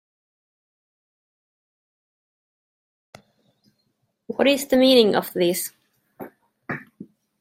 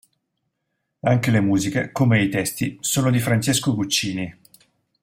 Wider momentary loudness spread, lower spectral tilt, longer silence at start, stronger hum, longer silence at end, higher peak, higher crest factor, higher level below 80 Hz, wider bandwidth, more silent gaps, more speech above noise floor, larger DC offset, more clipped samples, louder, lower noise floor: first, 27 LU vs 7 LU; about the same, -4 dB/octave vs -4.5 dB/octave; first, 4.3 s vs 1.05 s; neither; second, 0.35 s vs 0.7 s; about the same, -4 dBFS vs -6 dBFS; first, 22 dB vs 16 dB; second, -66 dBFS vs -54 dBFS; about the same, 16.5 kHz vs 16 kHz; neither; about the same, 53 dB vs 56 dB; neither; neither; about the same, -19 LUFS vs -21 LUFS; second, -72 dBFS vs -76 dBFS